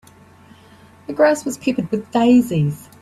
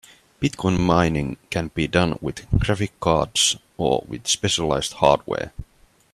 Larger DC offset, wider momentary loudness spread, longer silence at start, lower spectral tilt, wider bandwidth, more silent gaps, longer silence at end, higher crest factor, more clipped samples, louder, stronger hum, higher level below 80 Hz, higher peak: neither; about the same, 10 LU vs 9 LU; first, 1.1 s vs 0.4 s; first, -6.5 dB/octave vs -4 dB/octave; about the same, 14 kHz vs 13.5 kHz; neither; second, 0.2 s vs 0.5 s; second, 16 dB vs 22 dB; neither; first, -18 LUFS vs -22 LUFS; neither; second, -54 dBFS vs -38 dBFS; about the same, -2 dBFS vs 0 dBFS